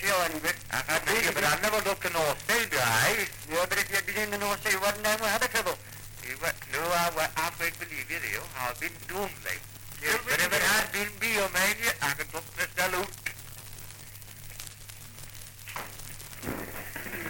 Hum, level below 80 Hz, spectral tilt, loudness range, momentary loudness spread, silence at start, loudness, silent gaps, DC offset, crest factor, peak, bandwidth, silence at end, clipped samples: none; -52 dBFS; -2 dB/octave; 10 LU; 18 LU; 0 s; -28 LUFS; none; under 0.1%; 16 dB; -14 dBFS; 17 kHz; 0 s; under 0.1%